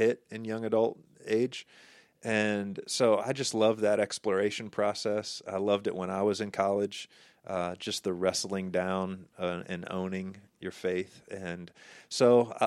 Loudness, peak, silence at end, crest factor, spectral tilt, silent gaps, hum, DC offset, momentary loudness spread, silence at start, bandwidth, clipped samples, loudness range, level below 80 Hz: -31 LUFS; -12 dBFS; 0 s; 20 dB; -4.5 dB/octave; none; none; under 0.1%; 15 LU; 0 s; 14 kHz; under 0.1%; 5 LU; -74 dBFS